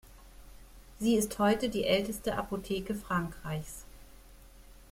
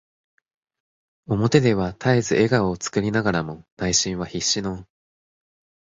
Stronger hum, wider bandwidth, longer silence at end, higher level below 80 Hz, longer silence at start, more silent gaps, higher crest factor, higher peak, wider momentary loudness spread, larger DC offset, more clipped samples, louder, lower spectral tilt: neither; first, 16.5 kHz vs 8 kHz; second, 0.05 s vs 1 s; about the same, -52 dBFS vs -48 dBFS; second, 0.05 s vs 1.3 s; second, none vs 3.72-3.77 s; about the same, 20 dB vs 22 dB; second, -14 dBFS vs -2 dBFS; about the same, 11 LU vs 10 LU; neither; neither; second, -32 LUFS vs -21 LUFS; about the same, -5 dB/octave vs -4.5 dB/octave